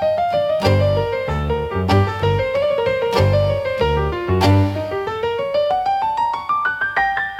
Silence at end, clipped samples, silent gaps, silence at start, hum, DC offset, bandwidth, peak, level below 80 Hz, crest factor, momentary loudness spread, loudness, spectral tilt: 0 s; under 0.1%; none; 0 s; none; under 0.1%; 13.5 kHz; -2 dBFS; -36 dBFS; 16 dB; 5 LU; -18 LUFS; -7 dB/octave